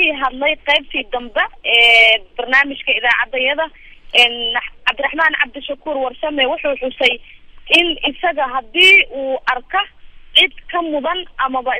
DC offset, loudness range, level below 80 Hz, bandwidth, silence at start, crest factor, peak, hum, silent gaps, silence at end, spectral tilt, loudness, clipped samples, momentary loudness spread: under 0.1%; 4 LU; -42 dBFS; 16 kHz; 0 s; 16 dB; 0 dBFS; none; none; 0 s; -1.5 dB/octave; -14 LUFS; under 0.1%; 13 LU